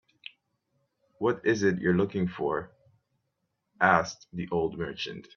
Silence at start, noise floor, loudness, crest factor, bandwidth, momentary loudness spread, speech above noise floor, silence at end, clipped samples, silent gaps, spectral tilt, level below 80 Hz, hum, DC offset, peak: 1.2 s; -80 dBFS; -28 LUFS; 24 dB; 7 kHz; 14 LU; 52 dB; 0.15 s; under 0.1%; none; -6 dB/octave; -62 dBFS; none; under 0.1%; -6 dBFS